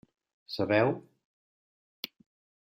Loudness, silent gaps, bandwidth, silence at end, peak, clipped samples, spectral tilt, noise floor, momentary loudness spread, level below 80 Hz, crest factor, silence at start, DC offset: -29 LUFS; none; 15.5 kHz; 1.7 s; -12 dBFS; under 0.1%; -6.5 dB/octave; under -90 dBFS; 17 LU; -72 dBFS; 22 dB; 0.5 s; under 0.1%